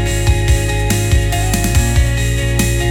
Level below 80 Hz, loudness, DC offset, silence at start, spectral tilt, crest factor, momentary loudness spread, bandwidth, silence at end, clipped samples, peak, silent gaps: -18 dBFS; -15 LUFS; under 0.1%; 0 s; -4.5 dB/octave; 12 dB; 2 LU; 19 kHz; 0 s; under 0.1%; 0 dBFS; none